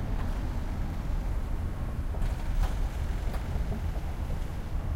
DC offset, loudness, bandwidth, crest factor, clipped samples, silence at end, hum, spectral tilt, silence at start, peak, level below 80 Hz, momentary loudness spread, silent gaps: under 0.1%; -35 LUFS; 15.5 kHz; 12 dB; under 0.1%; 0 s; none; -7 dB/octave; 0 s; -18 dBFS; -32 dBFS; 3 LU; none